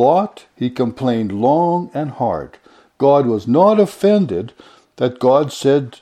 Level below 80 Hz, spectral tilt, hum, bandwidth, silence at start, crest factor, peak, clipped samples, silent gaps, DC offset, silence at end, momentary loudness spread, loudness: -56 dBFS; -7.5 dB/octave; none; 14.5 kHz; 0 s; 16 dB; 0 dBFS; under 0.1%; none; under 0.1%; 0.05 s; 11 LU; -16 LUFS